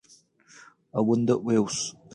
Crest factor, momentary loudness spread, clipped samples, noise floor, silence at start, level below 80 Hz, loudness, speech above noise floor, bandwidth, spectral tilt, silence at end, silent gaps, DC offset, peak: 18 dB; 7 LU; under 0.1%; -58 dBFS; 0.95 s; -68 dBFS; -25 LUFS; 34 dB; 11.5 kHz; -5.5 dB/octave; 0.25 s; none; under 0.1%; -10 dBFS